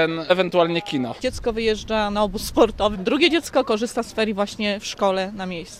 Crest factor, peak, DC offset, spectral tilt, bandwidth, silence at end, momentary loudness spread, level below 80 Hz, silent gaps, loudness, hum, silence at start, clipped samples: 18 dB; -2 dBFS; under 0.1%; -4.5 dB/octave; 16 kHz; 0 s; 7 LU; -42 dBFS; none; -22 LUFS; none; 0 s; under 0.1%